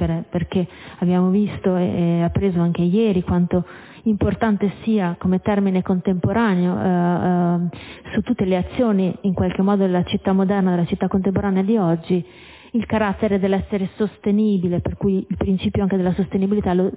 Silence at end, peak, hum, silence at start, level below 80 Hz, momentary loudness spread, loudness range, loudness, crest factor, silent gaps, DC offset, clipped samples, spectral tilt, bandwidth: 0 s; -6 dBFS; none; 0 s; -40 dBFS; 5 LU; 1 LU; -20 LUFS; 14 dB; none; under 0.1%; under 0.1%; -12 dB/octave; 4 kHz